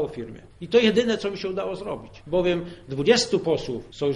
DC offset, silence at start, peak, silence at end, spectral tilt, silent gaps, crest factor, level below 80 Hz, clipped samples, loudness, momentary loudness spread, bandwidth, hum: under 0.1%; 0 s; -4 dBFS; 0 s; -4.5 dB/octave; none; 20 dB; -50 dBFS; under 0.1%; -24 LUFS; 15 LU; 11.5 kHz; none